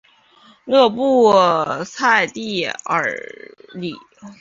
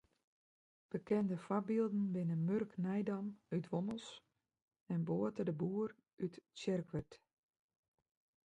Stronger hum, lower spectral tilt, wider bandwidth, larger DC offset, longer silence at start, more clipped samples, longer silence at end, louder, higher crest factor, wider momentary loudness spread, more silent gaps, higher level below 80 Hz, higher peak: neither; second, -4 dB/octave vs -8 dB/octave; second, 7.6 kHz vs 9.2 kHz; neither; second, 0.65 s vs 0.95 s; neither; second, 0.05 s vs 1.3 s; first, -16 LUFS vs -40 LUFS; about the same, 18 dB vs 16 dB; first, 18 LU vs 9 LU; second, none vs 4.62-4.68 s, 4.81-4.86 s, 6.13-6.17 s; first, -64 dBFS vs -76 dBFS; first, 0 dBFS vs -24 dBFS